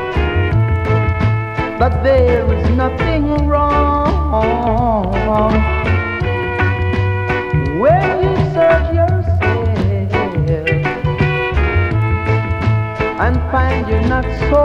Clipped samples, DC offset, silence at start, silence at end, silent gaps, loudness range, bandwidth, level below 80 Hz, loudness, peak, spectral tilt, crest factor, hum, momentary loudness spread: under 0.1%; under 0.1%; 0 s; 0 s; none; 2 LU; 7 kHz; -22 dBFS; -15 LUFS; 0 dBFS; -8.5 dB/octave; 14 dB; none; 4 LU